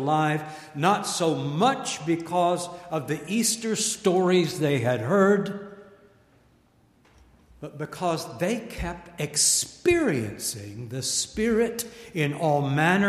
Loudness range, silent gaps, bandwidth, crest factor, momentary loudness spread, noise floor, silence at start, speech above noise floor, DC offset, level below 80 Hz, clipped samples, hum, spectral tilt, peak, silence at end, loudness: 8 LU; none; 15.5 kHz; 20 dB; 13 LU; -61 dBFS; 0 s; 36 dB; under 0.1%; -52 dBFS; under 0.1%; none; -4 dB/octave; -6 dBFS; 0 s; -25 LUFS